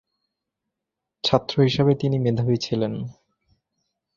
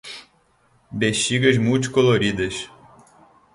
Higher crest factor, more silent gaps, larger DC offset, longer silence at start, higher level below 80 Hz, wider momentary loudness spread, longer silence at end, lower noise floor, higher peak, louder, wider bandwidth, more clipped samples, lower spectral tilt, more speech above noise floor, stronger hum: about the same, 22 dB vs 20 dB; neither; neither; first, 1.25 s vs 0.05 s; about the same, -54 dBFS vs -50 dBFS; second, 9 LU vs 19 LU; first, 1.05 s vs 0.9 s; first, -84 dBFS vs -60 dBFS; about the same, -2 dBFS vs -2 dBFS; second, -22 LUFS vs -19 LUFS; second, 7.4 kHz vs 11.5 kHz; neither; first, -7 dB/octave vs -4.5 dB/octave; first, 63 dB vs 41 dB; neither